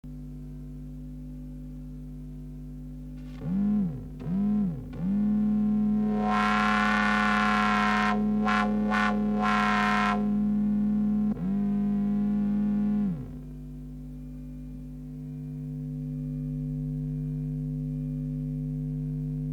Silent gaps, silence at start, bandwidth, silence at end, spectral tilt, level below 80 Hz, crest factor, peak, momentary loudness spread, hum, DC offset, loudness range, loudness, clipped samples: none; 0.05 s; 9.4 kHz; 0 s; -7 dB/octave; -44 dBFS; 18 dB; -10 dBFS; 18 LU; 50 Hz at -40 dBFS; under 0.1%; 12 LU; -27 LUFS; under 0.1%